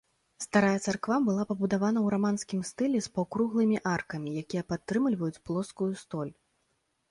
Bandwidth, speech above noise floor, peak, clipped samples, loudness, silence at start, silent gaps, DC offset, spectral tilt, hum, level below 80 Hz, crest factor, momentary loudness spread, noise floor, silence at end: 11.5 kHz; 47 dB; -12 dBFS; under 0.1%; -30 LUFS; 0.4 s; none; under 0.1%; -6 dB/octave; none; -64 dBFS; 18 dB; 9 LU; -76 dBFS; 0.8 s